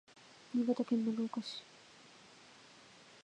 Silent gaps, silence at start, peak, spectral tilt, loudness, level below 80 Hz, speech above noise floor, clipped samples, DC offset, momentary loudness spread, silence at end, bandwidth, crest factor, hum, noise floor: none; 0.5 s; -22 dBFS; -5.5 dB/octave; -37 LUFS; -88 dBFS; 25 dB; under 0.1%; under 0.1%; 23 LU; 0.2 s; 9.8 kHz; 18 dB; none; -60 dBFS